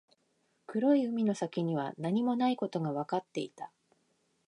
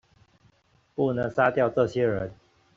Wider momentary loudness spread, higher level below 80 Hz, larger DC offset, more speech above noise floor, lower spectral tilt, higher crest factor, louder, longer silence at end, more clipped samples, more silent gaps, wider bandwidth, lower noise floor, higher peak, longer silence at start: about the same, 12 LU vs 12 LU; second, -84 dBFS vs -58 dBFS; neither; first, 44 dB vs 39 dB; about the same, -7 dB/octave vs -6 dB/octave; about the same, 16 dB vs 20 dB; second, -32 LUFS vs -25 LUFS; first, 0.8 s vs 0.45 s; neither; neither; first, 10.5 kHz vs 7.6 kHz; first, -75 dBFS vs -64 dBFS; second, -18 dBFS vs -8 dBFS; second, 0.7 s vs 1 s